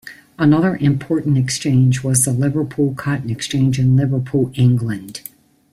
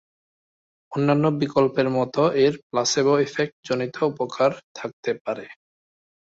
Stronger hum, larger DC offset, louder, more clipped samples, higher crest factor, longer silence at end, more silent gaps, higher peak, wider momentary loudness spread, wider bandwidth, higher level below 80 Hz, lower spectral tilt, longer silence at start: neither; neither; first, -17 LUFS vs -22 LUFS; neither; about the same, 16 dB vs 18 dB; second, 0.55 s vs 0.8 s; second, none vs 2.63-2.70 s, 3.52-3.63 s, 4.63-4.75 s, 4.93-5.03 s, 5.21-5.25 s; first, 0 dBFS vs -6 dBFS; about the same, 10 LU vs 11 LU; first, 14.5 kHz vs 8 kHz; first, -50 dBFS vs -64 dBFS; about the same, -6 dB/octave vs -5 dB/octave; second, 0.05 s vs 0.9 s